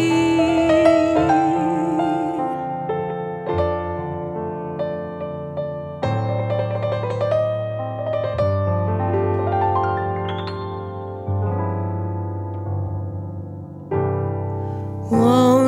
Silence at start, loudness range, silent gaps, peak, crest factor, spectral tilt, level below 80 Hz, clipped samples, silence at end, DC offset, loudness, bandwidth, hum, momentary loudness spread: 0 s; 7 LU; none; -2 dBFS; 18 dB; -7.5 dB/octave; -48 dBFS; under 0.1%; 0 s; under 0.1%; -22 LUFS; 14 kHz; none; 12 LU